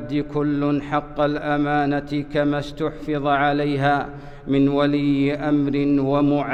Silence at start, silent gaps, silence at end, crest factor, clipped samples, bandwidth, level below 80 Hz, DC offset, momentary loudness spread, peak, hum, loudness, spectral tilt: 0 s; none; 0 s; 12 dB; under 0.1%; 6.6 kHz; -44 dBFS; under 0.1%; 6 LU; -8 dBFS; none; -21 LUFS; -8 dB/octave